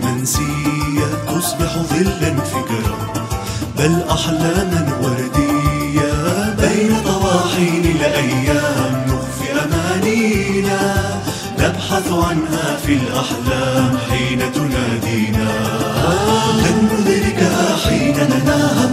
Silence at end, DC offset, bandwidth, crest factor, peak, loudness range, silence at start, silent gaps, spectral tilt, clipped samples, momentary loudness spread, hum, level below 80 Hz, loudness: 0 s; under 0.1%; 16 kHz; 14 dB; -2 dBFS; 3 LU; 0 s; none; -5 dB/octave; under 0.1%; 5 LU; none; -32 dBFS; -16 LUFS